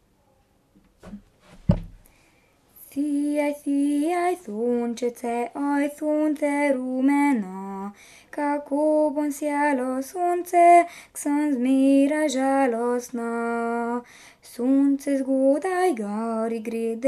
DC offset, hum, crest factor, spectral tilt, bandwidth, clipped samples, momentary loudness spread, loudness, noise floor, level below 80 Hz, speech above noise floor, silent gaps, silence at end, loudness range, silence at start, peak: under 0.1%; none; 18 dB; -6 dB/octave; 13.5 kHz; under 0.1%; 10 LU; -23 LUFS; -63 dBFS; -48 dBFS; 40 dB; none; 0 s; 6 LU; 1.05 s; -4 dBFS